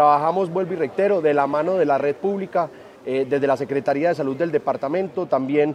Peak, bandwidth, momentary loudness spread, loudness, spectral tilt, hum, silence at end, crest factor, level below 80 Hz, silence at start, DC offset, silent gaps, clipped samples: -4 dBFS; 10 kHz; 6 LU; -21 LUFS; -7.5 dB/octave; none; 0 s; 16 dB; -70 dBFS; 0 s; under 0.1%; none; under 0.1%